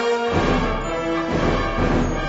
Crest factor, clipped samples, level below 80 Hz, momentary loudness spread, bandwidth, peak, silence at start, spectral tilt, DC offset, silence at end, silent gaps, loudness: 14 dB; under 0.1%; -28 dBFS; 4 LU; 8 kHz; -6 dBFS; 0 s; -6 dB/octave; under 0.1%; 0 s; none; -21 LUFS